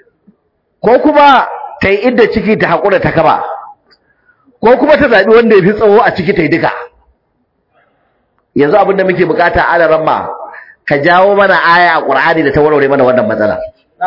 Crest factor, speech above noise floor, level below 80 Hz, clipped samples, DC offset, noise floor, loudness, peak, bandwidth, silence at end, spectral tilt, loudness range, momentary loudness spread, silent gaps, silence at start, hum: 10 dB; 53 dB; -40 dBFS; 0.6%; under 0.1%; -61 dBFS; -9 LUFS; 0 dBFS; 6 kHz; 0 s; -7.5 dB/octave; 4 LU; 10 LU; none; 0.85 s; none